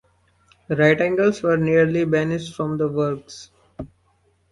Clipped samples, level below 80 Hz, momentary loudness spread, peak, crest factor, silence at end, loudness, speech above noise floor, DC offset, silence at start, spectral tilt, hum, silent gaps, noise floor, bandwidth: under 0.1%; -54 dBFS; 22 LU; -2 dBFS; 20 dB; 0.65 s; -20 LUFS; 43 dB; under 0.1%; 0.7 s; -7 dB/octave; none; none; -63 dBFS; 11.5 kHz